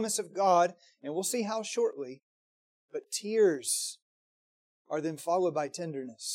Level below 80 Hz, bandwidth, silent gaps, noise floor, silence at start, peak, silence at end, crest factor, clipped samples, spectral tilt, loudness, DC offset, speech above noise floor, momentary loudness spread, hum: -88 dBFS; 16.5 kHz; 2.23-2.88 s, 4.02-4.85 s; under -90 dBFS; 0 s; -14 dBFS; 0 s; 18 dB; under 0.1%; -3 dB/octave; -31 LUFS; under 0.1%; over 59 dB; 16 LU; none